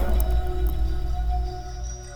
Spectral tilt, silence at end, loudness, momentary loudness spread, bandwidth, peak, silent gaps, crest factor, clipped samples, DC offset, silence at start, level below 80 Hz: -6 dB/octave; 0 s; -28 LUFS; 10 LU; over 20 kHz; -8 dBFS; none; 14 dB; under 0.1%; under 0.1%; 0 s; -24 dBFS